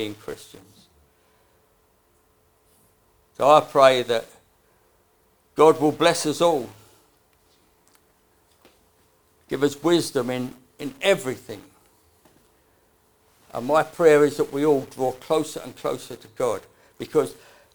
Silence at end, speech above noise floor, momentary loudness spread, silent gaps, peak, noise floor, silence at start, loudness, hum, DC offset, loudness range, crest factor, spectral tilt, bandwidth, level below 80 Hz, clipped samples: 0.4 s; 41 dB; 19 LU; none; -2 dBFS; -63 dBFS; 0 s; -21 LUFS; none; under 0.1%; 9 LU; 24 dB; -4.5 dB/octave; over 20 kHz; -66 dBFS; under 0.1%